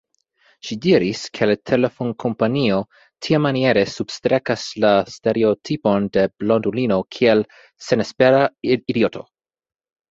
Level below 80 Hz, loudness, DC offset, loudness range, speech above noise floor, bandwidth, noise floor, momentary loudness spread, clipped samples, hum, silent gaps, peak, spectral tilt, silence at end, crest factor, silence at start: -56 dBFS; -19 LUFS; under 0.1%; 1 LU; 41 dB; 7.8 kHz; -60 dBFS; 7 LU; under 0.1%; none; none; -2 dBFS; -6 dB/octave; 0.9 s; 18 dB; 0.65 s